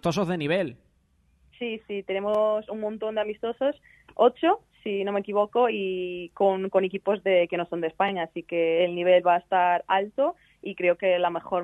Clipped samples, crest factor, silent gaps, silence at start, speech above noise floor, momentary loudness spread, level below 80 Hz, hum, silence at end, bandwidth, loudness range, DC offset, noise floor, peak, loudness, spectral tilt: under 0.1%; 18 dB; none; 0.05 s; 40 dB; 11 LU; -66 dBFS; none; 0 s; 11.5 kHz; 5 LU; under 0.1%; -65 dBFS; -8 dBFS; -25 LUFS; -6 dB/octave